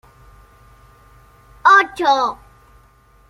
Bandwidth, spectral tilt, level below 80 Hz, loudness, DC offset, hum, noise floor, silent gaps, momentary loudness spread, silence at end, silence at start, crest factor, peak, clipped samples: 14 kHz; -2.5 dB/octave; -52 dBFS; -15 LUFS; under 0.1%; none; -51 dBFS; none; 12 LU; 0.95 s; 1.65 s; 18 dB; -2 dBFS; under 0.1%